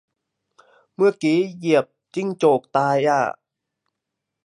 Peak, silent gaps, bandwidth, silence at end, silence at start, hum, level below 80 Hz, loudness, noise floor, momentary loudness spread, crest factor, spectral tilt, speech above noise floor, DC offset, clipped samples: -4 dBFS; none; 11.5 kHz; 1.15 s; 1 s; none; -76 dBFS; -20 LUFS; -82 dBFS; 9 LU; 18 dB; -6 dB/octave; 63 dB; under 0.1%; under 0.1%